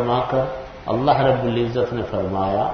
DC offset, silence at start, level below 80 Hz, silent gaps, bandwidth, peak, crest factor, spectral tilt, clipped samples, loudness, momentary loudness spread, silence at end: under 0.1%; 0 s; -44 dBFS; none; 6.4 kHz; -4 dBFS; 16 dB; -8.5 dB/octave; under 0.1%; -21 LUFS; 8 LU; 0 s